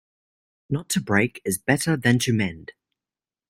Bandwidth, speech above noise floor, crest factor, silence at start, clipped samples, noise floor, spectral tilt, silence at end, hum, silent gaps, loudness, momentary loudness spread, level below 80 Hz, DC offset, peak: 16 kHz; over 67 dB; 22 dB; 0.7 s; under 0.1%; under -90 dBFS; -5 dB/octave; 0.8 s; none; none; -23 LUFS; 10 LU; -58 dBFS; under 0.1%; -4 dBFS